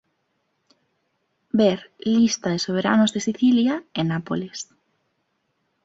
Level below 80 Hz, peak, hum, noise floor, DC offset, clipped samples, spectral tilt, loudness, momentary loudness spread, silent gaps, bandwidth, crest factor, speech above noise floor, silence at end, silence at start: -62 dBFS; -4 dBFS; none; -72 dBFS; under 0.1%; under 0.1%; -5 dB/octave; -21 LUFS; 10 LU; none; 8 kHz; 18 dB; 51 dB; 1.2 s; 1.55 s